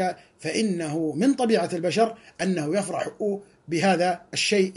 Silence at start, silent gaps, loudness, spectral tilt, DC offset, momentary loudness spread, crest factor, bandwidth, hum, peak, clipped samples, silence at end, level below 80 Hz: 0 s; none; -25 LUFS; -4.5 dB/octave; under 0.1%; 8 LU; 16 dB; 11.5 kHz; none; -8 dBFS; under 0.1%; 0 s; -68 dBFS